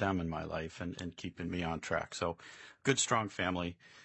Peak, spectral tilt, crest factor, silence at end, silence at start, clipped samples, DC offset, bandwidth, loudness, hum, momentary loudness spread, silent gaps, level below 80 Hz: -14 dBFS; -4 dB/octave; 22 dB; 0 s; 0 s; under 0.1%; under 0.1%; 8.2 kHz; -36 LUFS; none; 11 LU; none; -62 dBFS